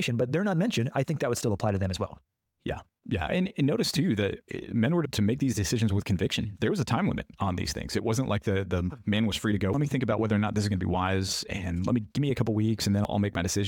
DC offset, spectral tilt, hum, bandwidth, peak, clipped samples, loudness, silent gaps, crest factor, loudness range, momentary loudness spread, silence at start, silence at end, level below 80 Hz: under 0.1%; -5.5 dB/octave; none; 17.5 kHz; -14 dBFS; under 0.1%; -28 LUFS; none; 14 dB; 2 LU; 5 LU; 0 s; 0 s; -50 dBFS